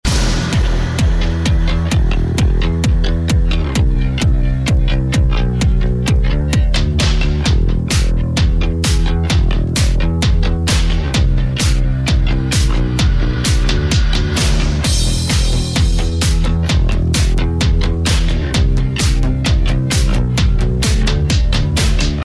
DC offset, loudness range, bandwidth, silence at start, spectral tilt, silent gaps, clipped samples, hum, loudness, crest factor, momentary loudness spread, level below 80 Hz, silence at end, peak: 0.3%; 0 LU; 11 kHz; 0.05 s; -5 dB/octave; none; under 0.1%; none; -16 LUFS; 10 dB; 1 LU; -16 dBFS; 0 s; -2 dBFS